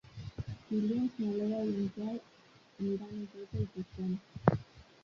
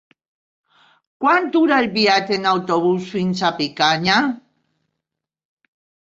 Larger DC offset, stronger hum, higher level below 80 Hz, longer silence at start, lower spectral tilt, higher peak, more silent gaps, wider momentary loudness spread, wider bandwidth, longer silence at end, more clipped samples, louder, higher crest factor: neither; neither; about the same, -58 dBFS vs -62 dBFS; second, 0.05 s vs 1.2 s; first, -8 dB/octave vs -5 dB/octave; second, -6 dBFS vs -2 dBFS; neither; first, 12 LU vs 6 LU; second, 7 kHz vs 7.8 kHz; second, 0.2 s vs 1.65 s; neither; second, -36 LUFS vs -17 LUFS; first, 30 dB vs 18 dB